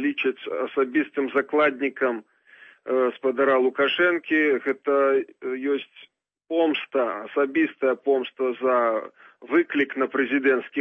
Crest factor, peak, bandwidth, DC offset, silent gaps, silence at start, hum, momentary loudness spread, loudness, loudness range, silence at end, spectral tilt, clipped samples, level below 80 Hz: 16 dB; -8 dBFS; 4 kHz; under 0.1%; none; 0 s; none; 7 LU; -23 LUFS; 3 LU; 0 s; -6.5 dB/octave; under 0.1%; -80 dBFS